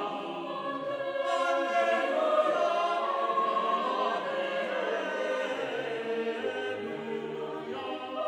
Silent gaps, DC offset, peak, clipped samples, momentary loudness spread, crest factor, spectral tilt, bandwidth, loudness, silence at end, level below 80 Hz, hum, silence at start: none; under 0.1%; -14 dBFS; under 0.1%; 9 LU; 16 dB; -4 dB/octave; 11.5 kHz; -30 LUFS; 0 s; -80 dBFS; none; 0 s